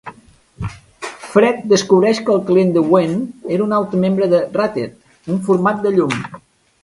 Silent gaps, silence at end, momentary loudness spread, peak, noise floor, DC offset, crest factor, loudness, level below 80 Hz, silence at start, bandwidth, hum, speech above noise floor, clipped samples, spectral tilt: none; 0.45 s; 16 LU; 0 dBFS; -46 dBFS; under 0.1%; 16 dB; -16 LUFS; -50 dBFS; 0.05 s; 11.5 kHz; none; 32 dB; under 0.1%; -6 dB/octave